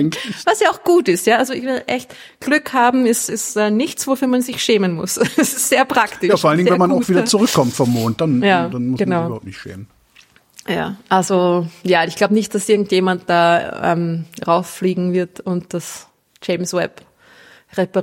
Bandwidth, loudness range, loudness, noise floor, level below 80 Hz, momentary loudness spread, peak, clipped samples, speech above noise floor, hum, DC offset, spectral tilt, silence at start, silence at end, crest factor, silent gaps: 16.5 kHz; 5 LU; -17 LUFS; -51 dBFS; -58 dBFS; 10 LU; -2 dBFS; under 0.1%; 34 dB; none; under 0.1%; -4.5 dB/octave; 0 s; 0 s; 16 dB; none